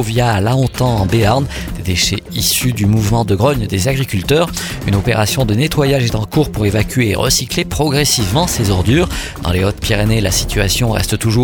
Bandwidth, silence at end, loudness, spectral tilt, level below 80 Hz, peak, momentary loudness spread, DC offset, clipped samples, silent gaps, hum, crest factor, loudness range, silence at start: 19 kHz; 0 s; -14 LUFS; -4.5 dB/octave; -28 dBFS; 0 dBFS; 4 LU; under 0.1%; under 0.1%; none; none; 14 dB; 1 LU; 0 s